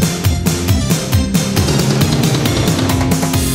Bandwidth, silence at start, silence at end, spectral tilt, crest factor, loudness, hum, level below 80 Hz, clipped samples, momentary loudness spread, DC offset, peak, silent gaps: 16.5 kHz; 0 s; 0 s; -5 dB/octave; 12 dB; -14 LUFS; none; -26 dBFS; under 0.1%; 2 LU; under 0.1%; -2 dBFS; none